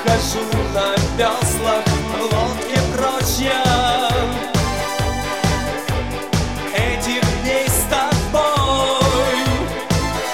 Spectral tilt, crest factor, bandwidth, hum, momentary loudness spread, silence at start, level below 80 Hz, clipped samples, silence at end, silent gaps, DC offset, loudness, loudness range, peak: -4 dB/octave; 16 dB; 17.5 kHz; none; 5 LU; 0 s; -28 dBFS; under 0.1%; 0 s; none; 0.7%; -18 LUFS; 3 LU; -2 dBFS